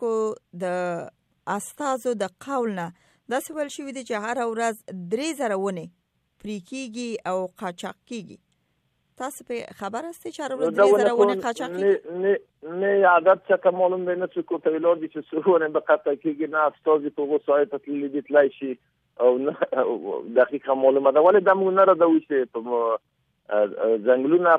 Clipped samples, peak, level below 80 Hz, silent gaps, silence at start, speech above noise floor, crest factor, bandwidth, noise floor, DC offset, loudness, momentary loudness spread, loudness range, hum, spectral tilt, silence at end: under 0.1%; -6 dBFS; -74 dBFS; none; 0 s; 48 dB; 18 dB; 14.5 kHz; -71 dBFS; under 0.1%; -23 LUFS; 16 LU; 12 LU; none; -5.5 dB/octave; 0 s